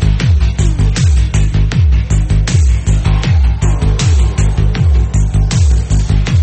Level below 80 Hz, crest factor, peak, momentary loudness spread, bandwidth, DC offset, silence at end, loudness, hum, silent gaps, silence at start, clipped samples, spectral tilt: -12 dBFS; 8 dB; -2 dBFS; 2 LU; 8.8 kHz; under 0.1%; 0 s; -12 LUFS; none; none; 0 s; under 0.1%; -6 dB/octave